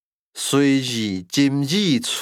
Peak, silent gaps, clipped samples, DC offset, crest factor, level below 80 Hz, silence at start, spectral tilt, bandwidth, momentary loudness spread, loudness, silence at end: -6 dBFS; none; under 0.1%; under 0.1%; 16 dB; -70 dBFS; 0.35 s; -4.5 dB/octave; 16 kHz; 8 LU; -20 LUFS; 0 s